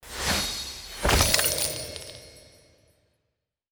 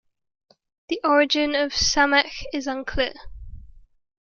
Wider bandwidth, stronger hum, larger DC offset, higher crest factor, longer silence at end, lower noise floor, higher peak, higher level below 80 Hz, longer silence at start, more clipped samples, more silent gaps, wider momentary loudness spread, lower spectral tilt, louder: first, over 20 kHz vs 7.2 kHz; neither; neither; first, 26 dB vs 20 dB; first, 1.3 s vs 0.55 s; first, -81 dBFS vs -44 dBFS; about the same, -4 dBFS vs -4 dBFS; about the same, -38 dBFS vs -42 dBFS; second, 0.05 s vs 0.9 s; neither; neither; first, 19 LU vs 10 LU; about the same, -2 dB/octave vs -2.5 dB/octave; second, -24 LUFS vs -21 LUFS